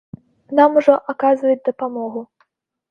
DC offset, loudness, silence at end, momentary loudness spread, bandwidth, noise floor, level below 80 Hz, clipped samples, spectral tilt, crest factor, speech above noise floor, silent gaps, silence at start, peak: under 0.1%; -17 LUFS; 0.65 s; 14 LU; 6.6 kHz; -64 dBFS; -66 dBFS; under 0.1%; -7 dB/octave; 18 dB; 48 dB; none; 0.5 s; 0 dBFS